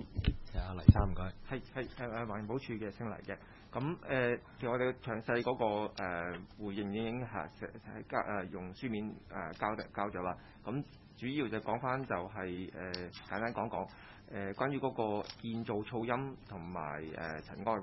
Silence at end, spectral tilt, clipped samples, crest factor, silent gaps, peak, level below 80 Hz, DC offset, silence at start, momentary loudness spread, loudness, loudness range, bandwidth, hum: 0 s; -6 dB/octave; under 0.1%; 30 dB; none; -6 dBFS; -48 dBFS; under 0.1%; 0 s; 10 LU; -38 LUFS; 5 LU; 5.8 kHz; none